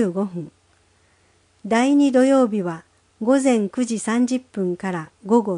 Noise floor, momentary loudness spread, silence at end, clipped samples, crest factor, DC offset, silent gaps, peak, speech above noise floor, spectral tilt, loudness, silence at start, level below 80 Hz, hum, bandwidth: -59 dBFS; 14 LU; 0 s; under 0.1%; 16 dB; under 0.1%; none; -4 dBFS; 40 dB; -5.5 dB/octave; -20 LUFS; 0 s; -66 dBFS; none; 10.5 kHz